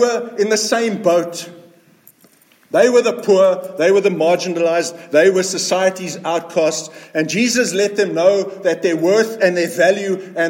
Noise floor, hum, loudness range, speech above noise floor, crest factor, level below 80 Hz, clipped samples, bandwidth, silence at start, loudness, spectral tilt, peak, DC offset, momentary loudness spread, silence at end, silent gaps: -52 dBFS; none; 2 LU; 36 dB; 14 dB; -70 dBFS; under 0.1%; 17 kHz; 0 s; -16 LUFS; -3.5 dB/octave; -2 dBFS; under 0.1%; 8 LU; 0 s; none